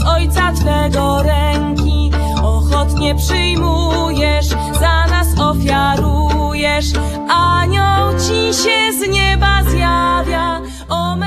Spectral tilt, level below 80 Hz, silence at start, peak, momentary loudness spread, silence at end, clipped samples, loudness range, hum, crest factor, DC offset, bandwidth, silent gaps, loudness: -5 dB/octave; -18 dBFS; 0 s; 0 dBFS; 4 LU; 0 s; under 0.1%; 2 LU; none; 14 dB; under 0.1%; 14 kHz; none; -14 LUFS